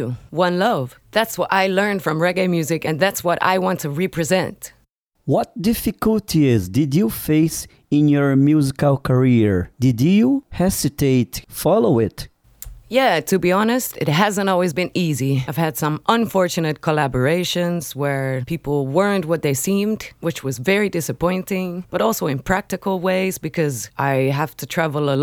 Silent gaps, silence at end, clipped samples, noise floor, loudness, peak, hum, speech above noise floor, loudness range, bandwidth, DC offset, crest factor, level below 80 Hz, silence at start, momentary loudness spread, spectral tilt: 4.95-5.05 s; 0 s; under 0.1%; -63 dBFS; -19 LUFS; 0 dBFS; none; 44 dB; 4 LU; over 20 kHz; under 0.1%; 18 dB; -46 dBFS; 0 s; 8 LU; -5.5 dB/octave